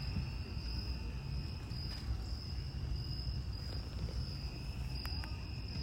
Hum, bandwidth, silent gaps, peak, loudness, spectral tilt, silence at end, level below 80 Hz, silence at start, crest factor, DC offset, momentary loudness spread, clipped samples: none; 16 kHz; none; -28 dBFS; -42 LUFS; -6 dB/octave; 0 s; -44 dBFS; 0 s; 12 dB; under 0.1%; 2 LU; under 0.1%